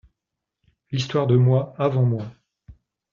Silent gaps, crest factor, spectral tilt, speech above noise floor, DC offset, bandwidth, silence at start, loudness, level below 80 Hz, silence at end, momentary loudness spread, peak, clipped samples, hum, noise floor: none; 18 dB; -7.5 dB/octave; 64 dB; under 0.1%; 7.2 kHz; 0.9 s; -21 LUFS; -58 dBFS; 0.4 s; 12 LU; -6 dBFS; under 0.1%; none; -84 dBFS